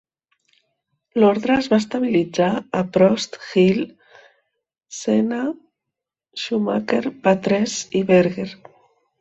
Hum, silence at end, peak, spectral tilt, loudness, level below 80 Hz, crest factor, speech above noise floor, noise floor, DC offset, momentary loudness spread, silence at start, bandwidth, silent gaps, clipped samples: none; 0.65 s; -2 dBFS; -5.5 dB/octave; -20 LUFS; -58 dBFS; 18 dB; 66 dB; -84 dBFS; under 0.1%; 13 LU; 1.15 s; 8.2 kHz; none; under 0.1%